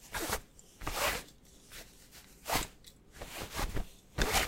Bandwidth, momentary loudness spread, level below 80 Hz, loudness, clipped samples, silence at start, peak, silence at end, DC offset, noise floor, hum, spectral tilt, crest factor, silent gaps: 16 kHz; 21 LU; -44 dBFS; -37 LUFS; under 0.1%; 0 s; -14 dBFS; 0 s; under 0.1%; -57 dBFS; none; -2.5 dB/octave; 24 dB; none